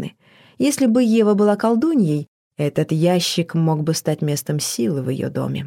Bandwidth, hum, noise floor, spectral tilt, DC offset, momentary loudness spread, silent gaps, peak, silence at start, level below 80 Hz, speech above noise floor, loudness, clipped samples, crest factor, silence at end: 17 kHz; none; -51 dBFS; -5.5 dB/octave; under 0.1%; 8 LU; 2.28-2.51 s; -4 dBFS; 0 s; -64 dBFS; 33 dB; -19 LUFS; under 0.1%; 14 dB; 0 s